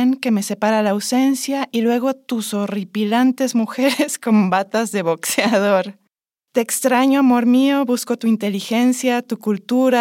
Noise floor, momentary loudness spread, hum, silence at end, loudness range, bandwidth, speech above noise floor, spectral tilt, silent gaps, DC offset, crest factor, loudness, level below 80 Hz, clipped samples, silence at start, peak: -73 dBFS; 8 LU; none; 0 s; 2 LU; 17 kHz; 56 dB; -4.5 dB/octave; none; under 0.1%; 14 dB; -18 LUFS; -78 dBFS; under 0.1%; 0 s; -2 dBFS